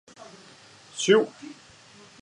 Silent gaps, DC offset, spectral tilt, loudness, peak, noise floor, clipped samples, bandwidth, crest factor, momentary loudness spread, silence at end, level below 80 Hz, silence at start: none; under 0.1%; -3.5 dB/octave; -23 LUFS; -6 dBFS; -52 dBFS; under 0.1%; 11 kHz; 22 dB; 26 LU; 0.7 s; -76 dBFS; 0.95 s